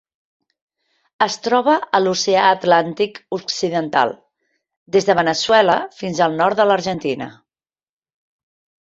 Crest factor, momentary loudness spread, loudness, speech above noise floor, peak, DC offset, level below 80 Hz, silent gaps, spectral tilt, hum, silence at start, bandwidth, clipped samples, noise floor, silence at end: 18 dB; 9 LU; -17 LUFS; over 73 dB; -2 dBFS; under 0.1%; -60 dBFS; 4.77-4.86 s; -4 dB/octave; none; 1.2 s; 8 kHz; under 0.1%; under -90 dBFS; 1.5 s